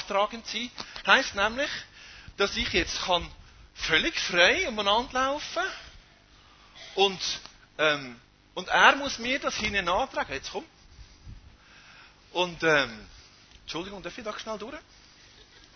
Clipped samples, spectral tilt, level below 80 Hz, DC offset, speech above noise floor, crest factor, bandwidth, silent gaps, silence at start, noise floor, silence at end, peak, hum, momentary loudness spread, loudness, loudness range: under 0.1%; -2.5 dB/octave; -52 dBFS; under 0.1%; 29 dB; 26 dB; 6.6 kHz; none; 0 s; -56 dBFS; 0.95 s; -2 dBFS; none; 20 LU; -26 LUFS; 6 LU